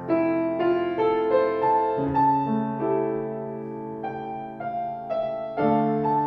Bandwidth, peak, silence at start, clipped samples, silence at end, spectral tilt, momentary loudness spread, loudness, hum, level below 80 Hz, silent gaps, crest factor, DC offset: 5.4 kHz; -10 dBFS; 0 s; under 0.1%; 0 s; -10 dB/octave; 11 LU; -25 LUFS; none; -58 dBFS; none; 14 dB; under 0.1%